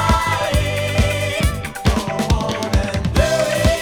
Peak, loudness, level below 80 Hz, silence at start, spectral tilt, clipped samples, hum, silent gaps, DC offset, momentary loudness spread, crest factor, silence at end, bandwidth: 0 dBFS; -19 LUFS; -24 dBFS; 0 s; -5 dB/octave; under 0.1%; none; none; under 0.1%; 4 LU; 18 dB; 0 s; over 20 kHz